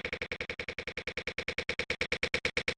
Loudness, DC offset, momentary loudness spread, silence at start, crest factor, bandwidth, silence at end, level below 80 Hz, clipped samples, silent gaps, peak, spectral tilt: -35 LUFS; under 0.1%; 7 LU; 0.05 s; 22 dB; 12 kHz; 0.05 s; -54 dBFS; under 0.1%; none; -14 dBFS; -3 dB/octave